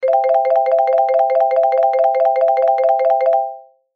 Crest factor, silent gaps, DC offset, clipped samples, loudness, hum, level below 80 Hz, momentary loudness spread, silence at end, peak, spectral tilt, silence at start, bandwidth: 10 dB; none; under 0.1%; under 0.1%; -15 LUFS; none; -82 dBFS; 1 LU; 0.35 s; -6 dBFS; -2 dB/octave; 0 s; 5.4 kHz